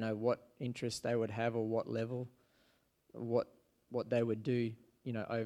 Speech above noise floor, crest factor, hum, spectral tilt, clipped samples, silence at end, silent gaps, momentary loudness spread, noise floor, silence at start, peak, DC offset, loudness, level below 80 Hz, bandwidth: 37 dB; 18 dB; none; -6.5 dB/octave; under 0.1%; 0 s; none; 11 LU; -74 dBFS; 0 s; -20 dBFS; under 0.1%; -38 LUFS; -76 dBFS; 14 kHz